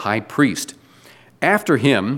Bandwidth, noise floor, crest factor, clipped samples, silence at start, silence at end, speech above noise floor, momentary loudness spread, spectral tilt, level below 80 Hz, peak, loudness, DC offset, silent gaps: 17 kHz; -48 dBFS; 18 dB; under 0.1%; 0 s; 0 s; 30 dB; 10 LU; -5 dB/octave; -64 dBFS; -2 dBFS; -18 LUFS; under 0.1%; none